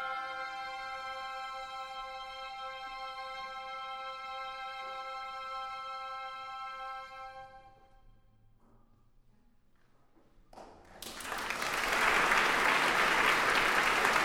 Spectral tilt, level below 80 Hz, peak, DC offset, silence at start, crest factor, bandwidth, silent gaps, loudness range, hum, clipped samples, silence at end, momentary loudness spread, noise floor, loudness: -1.5 dB/octave; -60 dBFS; -12 dBFS; under 0.1%; 0 s; 24 dB; over 20 kHz; none; 19 LU; none; under 0.1%; 0 s; 16 LU; -64 dBFS; -33 LUFS